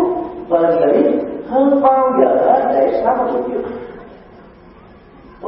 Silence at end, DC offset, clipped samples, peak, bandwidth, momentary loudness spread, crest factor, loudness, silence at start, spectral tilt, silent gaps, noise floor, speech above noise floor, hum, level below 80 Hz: 0 s; under 0.1%; under 0.1%; 0 dBFS; 5.4 kHz; 11 LU; 16 dB; -15 LUFS; 0 s; -11.5 dB/octave; none; -42 dBFS; 28 dB; none; -50 dBFS